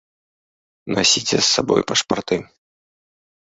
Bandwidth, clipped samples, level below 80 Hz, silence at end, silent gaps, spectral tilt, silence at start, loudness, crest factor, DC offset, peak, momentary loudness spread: 8.4 kHz; under 0.1%; -54 dBFS; 1.1 s; none; -2.5 dB/octave; 0.85 s; -18 LUFS; 20 dB; under 0.1%; -2 dBFS; 9 LU